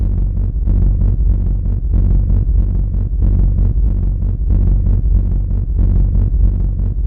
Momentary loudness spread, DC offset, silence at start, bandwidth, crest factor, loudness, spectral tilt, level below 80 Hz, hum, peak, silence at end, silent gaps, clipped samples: 4 LU; under 0.1%; 0 s; 1.4 kHz; 10 dB; -17 LUFS; -13 dB/octave; -14 dBFS; none; -4 dBFS; 0 s; none; under 0.1%